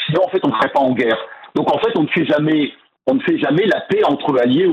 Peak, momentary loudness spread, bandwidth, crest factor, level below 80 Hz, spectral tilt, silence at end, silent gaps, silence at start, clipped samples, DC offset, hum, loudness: -6 dBFS; 5 LU; 7.8 kHz; 10 dB; -58 dBFS; -7.5 dB/octave; 0 s; none; 0 s; under 0.1%; under 0.1%; none; -17 LUFS